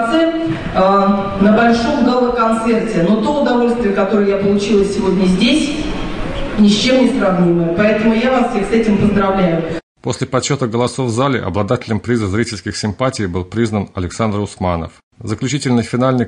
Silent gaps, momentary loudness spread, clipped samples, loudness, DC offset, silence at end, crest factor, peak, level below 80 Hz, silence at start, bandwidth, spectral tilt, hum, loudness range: 9.83-9.95 s, 15.03-15.11 s; 9 LU; under 0.1%; -15 LUFS; under 0.1%; 0 s; 12 dB; -2 dBFS; -34 dBFS; 0 s; 10.5 kHz; -6 dB/octave; none; 5 LU